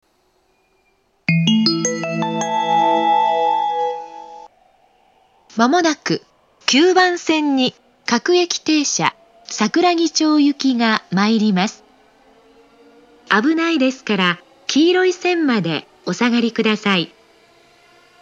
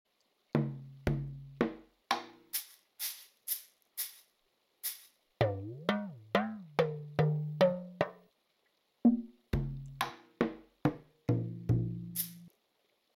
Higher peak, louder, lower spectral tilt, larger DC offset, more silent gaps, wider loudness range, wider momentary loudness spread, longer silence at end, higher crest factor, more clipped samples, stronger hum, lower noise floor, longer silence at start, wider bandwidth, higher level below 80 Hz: first, 0 dBFS vs -14 dBFS; first, -17 LUFS vs -36 LUFS; second, -4 dB/octave vs -6 dB/octave; neither; neither; second, 3 LU vs 6 LU; about the same, 9 LU vs 10 LU; first, 1.15 s vs 0.65 s; about the same, 18 dB vs 22 dB; neither; neither; second, -61 dBFS vs -76 dBFS; first, 1.3 s vs 0.55 s; second, 8 kHz vs 19 kHz; second, -70 dBFS vs -54 dBFS